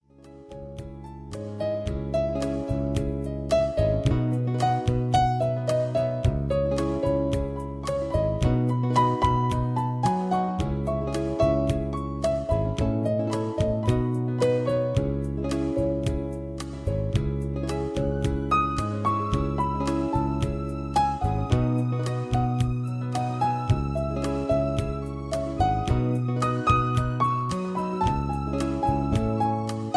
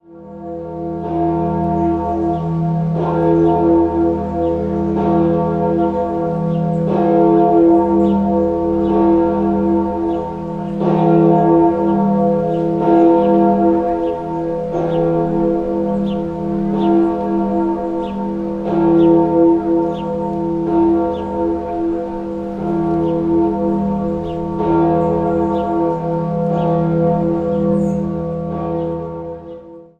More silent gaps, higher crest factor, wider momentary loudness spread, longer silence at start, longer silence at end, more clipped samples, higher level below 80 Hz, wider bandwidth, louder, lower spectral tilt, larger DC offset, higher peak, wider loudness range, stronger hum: neither; about the same, 18 dB vs 14 dB; second, 7 LU vs 10 LU; first, 0.25 s vs 0.1 s; second, 0 s vs 0.15 s; neither; about the same, -36 dBFS vs -38 dBFS; first, 11 kHz vs 4.7 kHz; second, -26 LUFS vs -16 LUFS; second, -7.5 dB/octave vs -10.5 dB/octave; neither; second, -8 dBFS vs 0 dBFS; about the same, 3 LU vs 4 LU; neither